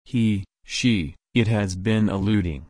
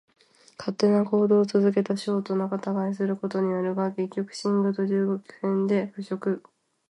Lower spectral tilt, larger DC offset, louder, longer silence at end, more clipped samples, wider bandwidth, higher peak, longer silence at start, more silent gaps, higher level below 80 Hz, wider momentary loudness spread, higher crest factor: second, -6 dB/octave vs -7.5 dB/octave; neither; first, -23 LUFS vs -26 LUFS; second, 0.05 s vs 0.5 s; neither; about the same, 10.5 kHz vs 11 kHz; about the same, -8 dBFS vs -10 dBFS; second, 0.1 s vs 0.6 s; neither; first, -42 dBFS vs -74 dBFS; second, 4 LU vs 9 LU; about the same, 16 dB vs 16 dB